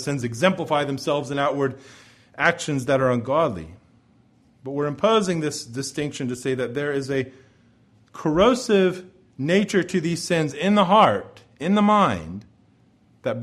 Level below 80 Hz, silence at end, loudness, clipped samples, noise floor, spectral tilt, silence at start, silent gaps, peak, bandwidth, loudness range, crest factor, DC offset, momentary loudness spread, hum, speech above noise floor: -54 dBFS; 0 s; -22 LUFS; under 0.1%; -58 dBFS; -5.5 dB/octave; 0 s; none; -2 dBFS; 13 kHz; 5 LU; 20 dB; under 0.1%; 13 LU; none; 36 dB